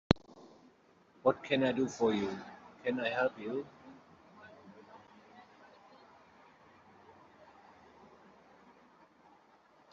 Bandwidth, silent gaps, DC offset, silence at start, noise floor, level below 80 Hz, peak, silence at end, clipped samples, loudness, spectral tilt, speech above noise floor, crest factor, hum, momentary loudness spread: 7.4 kHz; none; under 0.1%; 0.1 s; -65 dBFS; -62 dBFS; -4 dBFS; 4.5 s; under 0.1%; -34 LUFS; -4.5 dB/octave; 32 dB; 34 dB; none; 27 LU